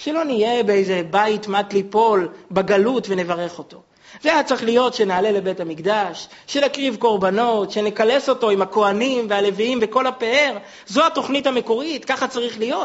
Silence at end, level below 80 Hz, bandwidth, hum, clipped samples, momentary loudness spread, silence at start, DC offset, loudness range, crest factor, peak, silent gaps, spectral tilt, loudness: 0 s; -62 dBFS; 8 kHz; none; under 0.1%; 6 LU; 0 s; under 0.1%; 2 LU; 18 dB; -2 dBFS; none; -2.5 dB/octave; -19 LUFS